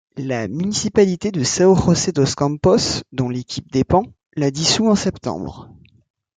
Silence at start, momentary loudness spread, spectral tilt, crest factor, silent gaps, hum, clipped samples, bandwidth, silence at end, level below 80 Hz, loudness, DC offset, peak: 0.15 s; 11 LU; -5 dB/octave; 16 dB; 4.26-4.30 s; none; under 0.1%; 9.6 kHz; 0.75 s; -44 dBFS; -18 LUFS; under 0.1%; -2 dBFS